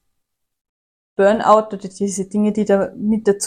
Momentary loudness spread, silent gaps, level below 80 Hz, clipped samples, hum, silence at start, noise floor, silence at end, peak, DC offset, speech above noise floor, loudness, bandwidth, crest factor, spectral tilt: 10 LU; none; -56 dBFS; under 0.1%; none; 1.2 s; -75 dBFS; 0 s; 0 dBFS; under 0.1%; 58 dB; -17 LUFS; 10.5 kHz; 18 dB; -5.5 dB/octave